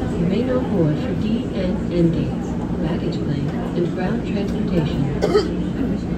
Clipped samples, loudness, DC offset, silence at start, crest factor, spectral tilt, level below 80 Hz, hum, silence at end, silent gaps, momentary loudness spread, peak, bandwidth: under 0.1%; -21 LUFS; under 0.1%; 0 s; 16 dB; -8 dB/octave; -34 dBFS; none; 0 s; none; 4 LU; -4 dBFS; 9 kHz